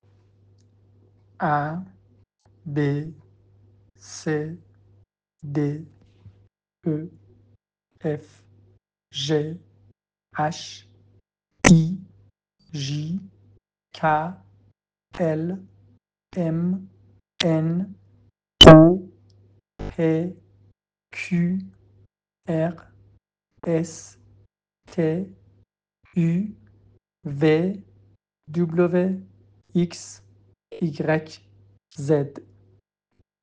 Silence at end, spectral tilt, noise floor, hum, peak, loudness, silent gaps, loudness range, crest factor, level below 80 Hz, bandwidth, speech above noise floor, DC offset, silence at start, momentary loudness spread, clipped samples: 1.05 s; -5.5 dB/octave; -68 dBFS; none; 0 dBFS; -21 LUFS; none; 16 LU; 24 dB; -44 dBFS; 9.6 kHz; 45 dB; under 0.1%; 1.4 s; 19 LU; under 0.1%